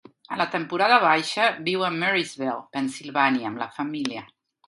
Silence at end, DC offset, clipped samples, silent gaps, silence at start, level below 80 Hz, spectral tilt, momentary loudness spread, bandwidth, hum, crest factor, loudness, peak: 0.4 s; under 0.1%; under 0.1%; none; 0.3 s; -74 dBFS; -4 dB/octave; 12 LU; 11.5 kHz; none; 20 dB; -23 LUFS; -4 dBFS